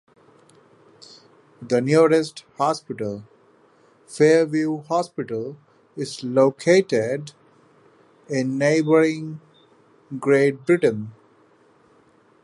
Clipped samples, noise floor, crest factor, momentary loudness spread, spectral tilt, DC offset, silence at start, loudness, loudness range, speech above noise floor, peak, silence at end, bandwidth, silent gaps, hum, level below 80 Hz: under 0.1%; -57 dBFS; 18 dB; 19 LU; -6 dB/octave; under 0.1%; 1.6 s; -21 LUFS; 3 LU; 37 dB; -4 dBFS; 1.35 s; 11.5 kHz; none; none; -70 dBFS